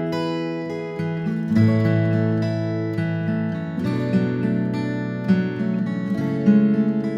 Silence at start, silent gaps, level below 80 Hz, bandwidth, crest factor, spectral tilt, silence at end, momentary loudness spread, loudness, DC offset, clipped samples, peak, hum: 0 s; none; -60 dBFS; 7.4 kHz; 16 dB; -9 dB/octave; 0 s; 8 LU; -22 LUFS; under 0.1%; under 0.1%; -6 dBFS; none